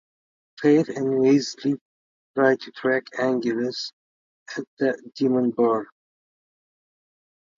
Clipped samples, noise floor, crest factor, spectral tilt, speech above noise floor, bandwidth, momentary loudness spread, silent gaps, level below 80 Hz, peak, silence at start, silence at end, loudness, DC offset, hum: under 0.1%; under -90 dBFS; 18 dB; -5.5 dB/octave; over 68 dB; 7.6 kHz; 13 LU; 1.81-2.34 s, 3.93-4.46 s, 4.67-4.77 s; -74 dBFS; -6 dBFS; 0.6 s; 1.75 s; -23 LUFS; under 0.1%; none